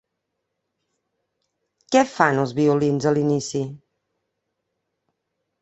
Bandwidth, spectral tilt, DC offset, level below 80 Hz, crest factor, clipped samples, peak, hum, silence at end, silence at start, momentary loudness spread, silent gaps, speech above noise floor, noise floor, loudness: 8.4 kHz; -6 dB/octave; under 0.1%; -64 dBFS; 24 dB; under 0.1%; 0 dBFS; none; 1.85 s; 1.9 s; 9 LU; none; 59 dB; -79 dBFS; -20 LUFS